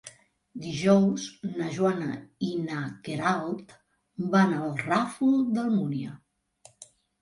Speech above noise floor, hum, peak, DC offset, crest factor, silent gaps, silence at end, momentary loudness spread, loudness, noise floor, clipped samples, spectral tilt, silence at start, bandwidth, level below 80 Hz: 32 dB; none; -10 dBFS; under 0.1%; 18 dB; none; 0.35 s; 14 LU; -27 LUFS; -59 dBFS; under 0.1%; -6.5 dB/octave; 0.05 s; 11.5 kHz; -68 dBFS